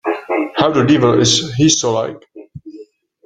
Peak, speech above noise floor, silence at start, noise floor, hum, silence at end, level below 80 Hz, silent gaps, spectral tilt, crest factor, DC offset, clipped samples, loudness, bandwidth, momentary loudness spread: 0 dBFS; 27 dB; 0.05 s; -40 dBFS; none; 0.45 s; -50 dBFS; none; -4 dB/octave; 16 dB; under 0.1%; under 0.1%; -14 LUFS; 9.2 kHz; 9 LU